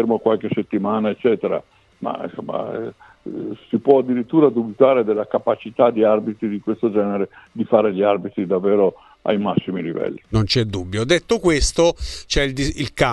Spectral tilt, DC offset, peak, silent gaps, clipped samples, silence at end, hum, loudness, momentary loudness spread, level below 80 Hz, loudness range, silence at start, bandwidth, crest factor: -5.5 dB/octave; under 0.1%; 0 dBFS; none; under 0.1%; 0 s; none; -20 LUFS; 12 LU; -36 dBFS; 5 LU; 0 s; 12 kHz; 18 dB